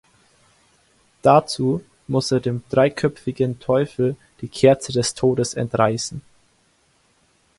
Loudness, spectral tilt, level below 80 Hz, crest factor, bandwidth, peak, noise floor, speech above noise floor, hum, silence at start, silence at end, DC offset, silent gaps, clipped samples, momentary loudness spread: -20 LUFS; -5.5 dB/octave; -54 dBFS; 20 dB; 11.5 kHz; 0 dBFS; -61 dBFS; 42 dB; none; 1.25 s; 1.4 s; under 0.1%; none; under 0.1%; 10 LU